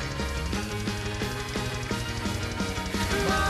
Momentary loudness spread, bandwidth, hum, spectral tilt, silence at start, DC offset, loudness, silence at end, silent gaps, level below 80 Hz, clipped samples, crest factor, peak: 4 LU; 15 kHz; none; -4.5 dB/octave; 0 s; under 0.1%; -30 LUFS; 0 s; none; -38 dBFS; under 0.1%; 14 dB; -14 dBFS